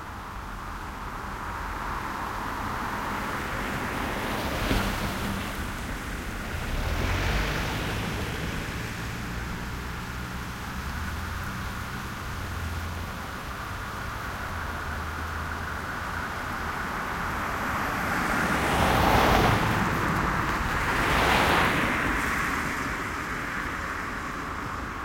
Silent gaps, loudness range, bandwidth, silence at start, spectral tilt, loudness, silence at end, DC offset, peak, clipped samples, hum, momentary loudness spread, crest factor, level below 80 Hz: none; 10 LU; 16.5 kHz; 0 s; -4.5 dB/octave; -29 LUFS; 0 s; under 0.1%; -6 dBFS; under 0.1%; none; 12 LU; 24 dB; -38 dBFS